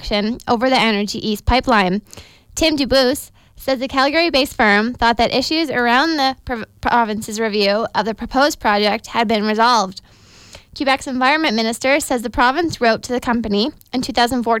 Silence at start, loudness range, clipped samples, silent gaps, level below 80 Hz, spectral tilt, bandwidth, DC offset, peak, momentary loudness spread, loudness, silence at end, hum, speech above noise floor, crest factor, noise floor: 0 s; 2 LU; under 0.1%; none; -38 dBFS; -4 dB/octave; 17 kHz; under 0.1%; -4 dBFS; 7 LU; -17 LUFS; 0 s; none; 26 dB; 14 dB; -43 dBFS